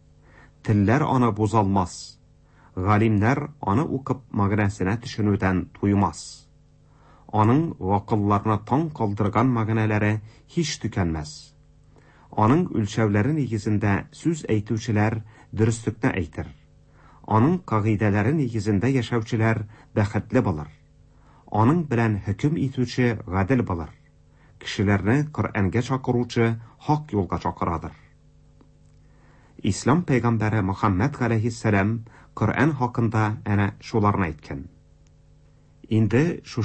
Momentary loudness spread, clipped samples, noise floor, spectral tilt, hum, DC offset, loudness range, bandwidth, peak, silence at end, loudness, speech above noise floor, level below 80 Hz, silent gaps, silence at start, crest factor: 10 LU; under 0.1%; -55 dBFS; -7 dB/octave; none; under 0.1%; 3 LU; 8.8 kHz; -6 dBFS; 0 s; -23 LUFS; 32 dB; -48 dBFS; none; 0.65 s; 18 dB